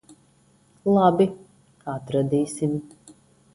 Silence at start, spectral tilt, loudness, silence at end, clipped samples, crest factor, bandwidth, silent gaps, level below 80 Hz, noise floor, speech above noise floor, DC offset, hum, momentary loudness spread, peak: 0.85 s; -7.5 dB/octave; -23 LUFS; 0.7 s; under 0.1%; 20 dB; 11.5 kHz; none; -62 dBFS; -59 dBFS; 38 dB; under 0.1%; none; 15 LU; -4 dBFS